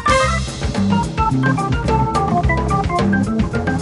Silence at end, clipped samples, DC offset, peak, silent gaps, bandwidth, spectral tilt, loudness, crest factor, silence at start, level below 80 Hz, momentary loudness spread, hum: 0 s; under 0.1%; under 0.1%; -2 dBFS; none; 11.5 kHz; -6 dB/octave; -17 LUFS; 14 dB; 0 s; -26 dBFS; 3 LU; none